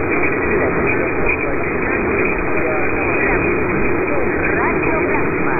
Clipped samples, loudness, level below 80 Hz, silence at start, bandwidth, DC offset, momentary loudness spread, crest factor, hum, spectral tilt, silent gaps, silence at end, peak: under 0.1%; -17 LUFS; -32 dBFS; 0 s; 13 kHz; under 0.1%; 2 LU; 14 dB; none; -13 dB/octave; none; 0 s; -2 dBFS